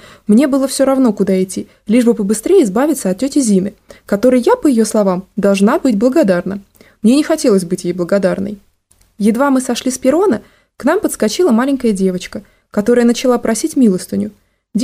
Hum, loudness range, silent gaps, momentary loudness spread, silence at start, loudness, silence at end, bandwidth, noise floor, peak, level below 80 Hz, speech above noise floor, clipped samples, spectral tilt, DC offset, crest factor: none; 2 LU; none; 10 LU; 0.3 s; -14 LUFS; 0 s; 15.5 kHz; -54 dBFS; 0 dBFS; -50 dBFS; 41 dB; under 0.1%; -5.5 dB/octave; under 0.1%; 12 dB